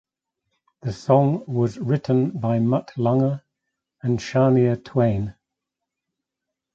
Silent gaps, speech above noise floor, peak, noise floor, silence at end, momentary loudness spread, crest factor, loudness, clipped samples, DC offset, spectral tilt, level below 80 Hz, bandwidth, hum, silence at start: none; 64 dB; -2 dBFS; -84 dBFS; 1.45 s; 12 LU; 20 dB; -21 LUFS; under 0.1%; under 0.1%; -8.5 dB/octave; -54 dBFS; 7.6 kHz; none; 0.85 s